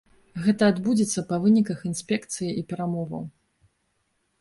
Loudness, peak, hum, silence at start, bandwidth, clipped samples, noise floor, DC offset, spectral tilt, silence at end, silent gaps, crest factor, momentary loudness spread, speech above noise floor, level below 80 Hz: -25 LUFS; -8 dBFS; none; 0.35 s; 11.5 kHz; under 0.1%; -72 dBFS; under 0.1%; -5.5 dB/octave; 1.1 s; none; 18 dB; 12 LU; 49 dB; -62 dBFS